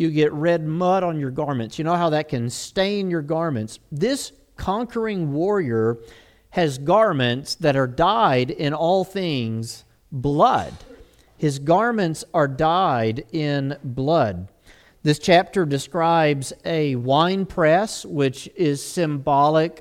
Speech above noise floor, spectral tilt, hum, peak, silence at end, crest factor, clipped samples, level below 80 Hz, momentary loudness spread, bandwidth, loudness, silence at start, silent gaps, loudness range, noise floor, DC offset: 31 dB; -6 dB/octave; none; -2 dBFS; 0 s; 20 dB; under 0.1%; -50 dBFS; 9 LU; 15.5 kHz; -21 LUFS; 0 s; none; 4 LU; -52 dBFS; under 0.1%